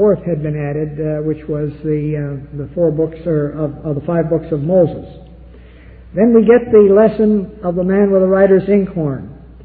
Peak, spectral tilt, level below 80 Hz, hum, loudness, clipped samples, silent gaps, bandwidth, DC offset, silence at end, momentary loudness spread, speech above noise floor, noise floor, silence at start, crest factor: 0 dBFS; -13 dB/octave; -40 dBFS; none; -15 LUFS; under 0.1%; none; 4.4 kHz; under 0.1%; 0 s; 12 LU; 24 dB; -38 dBFS; 0 s; 14 dB